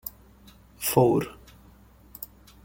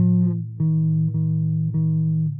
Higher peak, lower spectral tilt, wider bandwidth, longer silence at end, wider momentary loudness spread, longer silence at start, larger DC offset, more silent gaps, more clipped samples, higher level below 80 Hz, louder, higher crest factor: first, -6 dBFS vs -10 dBFS; second, -5.5 dB/octave vs -17.5 dB/octave; first, 17 kHz vs 1.2 kHz; first, 0.4 s vs 0 s; first, 20 LU vs 3 LU; about the same, 0.05 s vs 0 s; neither; neither; neither; first, -54 dBFS vs -62 dBFS; second, -24 LUFS vs -21 LUFS; first, 24 dB vs 10 dB